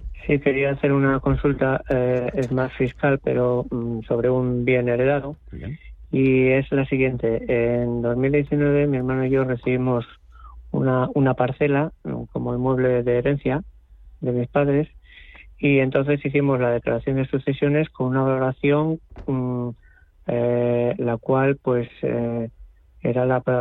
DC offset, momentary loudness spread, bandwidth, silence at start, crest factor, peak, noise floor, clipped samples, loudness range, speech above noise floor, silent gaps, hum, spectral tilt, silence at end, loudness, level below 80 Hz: under 0.1%; 8 LU; 4.1 kHz; 0 s; 16 dB; -6 dBFS; -45 dBFS; under 0.1%; 2 LU; 24 dB; none; none; -10 dB/octave; 0 s; -22 LUFS; -42 dBFS